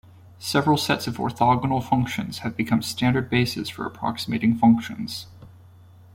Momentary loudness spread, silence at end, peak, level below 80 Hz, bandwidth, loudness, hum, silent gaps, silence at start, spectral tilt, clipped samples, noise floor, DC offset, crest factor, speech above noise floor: 12 LU; 0.65 s; -6 dBFS; -52 dBFS; 16.5 kHz; -23 LUFS; none; none; 0.4 s; -5.5 dB/octave; under 0.1%; -49 dBFS; under 0.1%; 18 dB; 26 dB